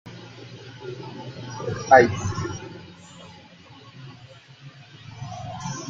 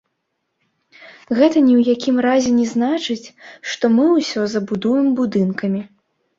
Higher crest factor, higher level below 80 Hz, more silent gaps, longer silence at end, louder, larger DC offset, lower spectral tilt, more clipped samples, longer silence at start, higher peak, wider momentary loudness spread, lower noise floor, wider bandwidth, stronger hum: first, 26 dB vs 16 dB; about the same, -58 dBFS vs -60 dBFS; neither; second, 0 s vs 0.5 s; second, -22 LUFS vs -17 LUFS; neither; about the same, -5 dB/octave vs -5.5 dB/octave; neither; second, 0.05 s vs 1 s; about the same, -2 dBFS vs -2 dBFS; first, 29 LU vs 11 LU; second, -48 dBFS vs -73 dBFS; about the same, 7.8 kHz vs 7.6 kHz; neither